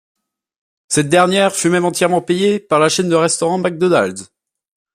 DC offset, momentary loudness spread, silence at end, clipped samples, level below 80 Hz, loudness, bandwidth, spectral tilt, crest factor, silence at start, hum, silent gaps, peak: under 0.1%; 5 LU; 0.7 s; under 0.1%; -58 dBFS; -15 LUFS; 15.5 kHz; -4 dB/octave; 16 dB; 0.9 s; none; none; 0 dBFS